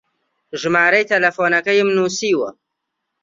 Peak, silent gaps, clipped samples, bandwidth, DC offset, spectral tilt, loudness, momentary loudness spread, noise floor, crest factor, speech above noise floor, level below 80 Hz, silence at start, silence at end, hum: -2 dBFS; none; under 0.1%; 7.8 kHz; under 0.1%; -3.5 dB/octave; -16 LUFS; 11 LU; -77 dBFS; 16 dB; 61 dB; -66 dBFS; 0.55 s; 0.7 s; none